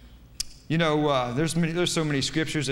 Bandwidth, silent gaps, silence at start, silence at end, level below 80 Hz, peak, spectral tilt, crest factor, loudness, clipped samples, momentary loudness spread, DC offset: 16 kHz; none; 0 s; 0 s; -48 dBFS; -10 dBFS; -4.5 dB/octave; 16 dB; -25 LUFS; under 0.1%; 11 LU; under 0.1%